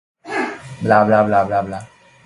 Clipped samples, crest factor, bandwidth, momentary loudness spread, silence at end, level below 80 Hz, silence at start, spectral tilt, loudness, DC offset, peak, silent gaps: under 0.1%; 18 dB; 11.5 kHz; 14 LU; 0.4 s; -52 dBFS; 0.25 s; -7 dB/octave; -17 LUFS; under 0.1%; 0 dBFS; none